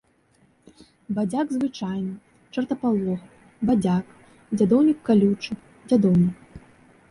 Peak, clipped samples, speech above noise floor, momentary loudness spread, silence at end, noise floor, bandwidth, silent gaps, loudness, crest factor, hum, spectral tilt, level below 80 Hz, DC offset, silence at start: -6 dBFS; under 0.1%; 40 dB; 15 LU; 0.55 s; -61 dBFS; 11.5 kHz; none; -23 LUFS; 16 dB; none; -8 dB/octave; -56 dBFS; under 0.1%; 1.1 s